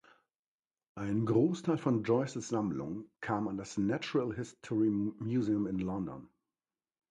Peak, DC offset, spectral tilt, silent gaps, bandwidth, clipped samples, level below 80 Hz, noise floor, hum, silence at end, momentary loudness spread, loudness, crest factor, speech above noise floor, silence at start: -16 dBFS; under 0.1%; -7 dB/octave; none; 9.8 kHz; under 0.1%; -64 dBFS; under -90 dBFS; none; 0.85 s; 12 LU; -34 LUFS; 18 dB; over 57 dB; 0.95 s